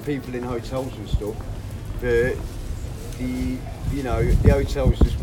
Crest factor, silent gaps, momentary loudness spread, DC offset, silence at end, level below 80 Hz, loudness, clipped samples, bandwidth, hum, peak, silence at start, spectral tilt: 22 dB; none; 14 LU; under 0.1%; 0 s; -26 dBFS; -25 LUFS; under 0.1%; 17 kHz; none; 0 dBFS; 0 s; -7 dB/octave